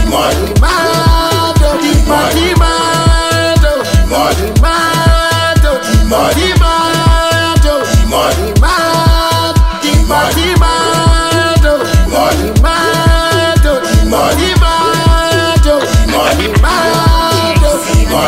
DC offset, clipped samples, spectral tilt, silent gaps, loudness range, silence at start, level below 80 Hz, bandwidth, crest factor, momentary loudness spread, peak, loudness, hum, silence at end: under 0.1%; under 0.1%; -4.5 dB/octave; none; 0 LU; 0 s; -14 dBFS; 16.5 kHz; 8 dB; 2 LU; 0 dBFS; -10 LUFS; none; 0 s